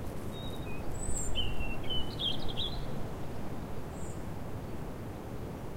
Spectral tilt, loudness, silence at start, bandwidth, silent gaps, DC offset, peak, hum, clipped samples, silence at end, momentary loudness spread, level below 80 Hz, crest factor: -4 dB/octave; -38 LUFS; 0 s; 16 kHz; none; under 0.1%; -18 dBFS; none; under 0.1%; 0 s; 8 LU; -42 dBFS; 14 dB